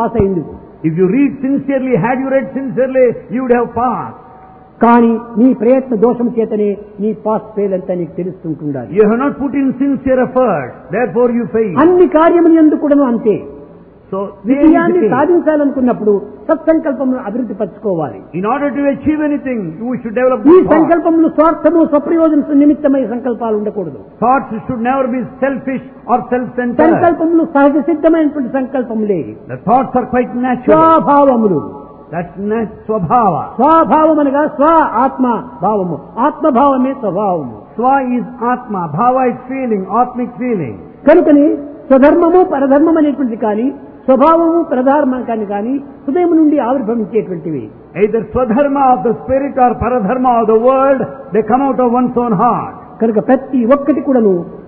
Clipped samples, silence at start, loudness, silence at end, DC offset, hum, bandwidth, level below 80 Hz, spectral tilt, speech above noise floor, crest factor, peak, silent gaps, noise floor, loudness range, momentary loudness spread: under 0.1%; 0 s; -12 LUFS; 0 s; under 0.1%; none; 3.8 kHz; -44 dBFS; -12 dB/octave; 26 dB; 12 dB; 0 dBFS; none; -38 dBFS; 5 LU; 11 LU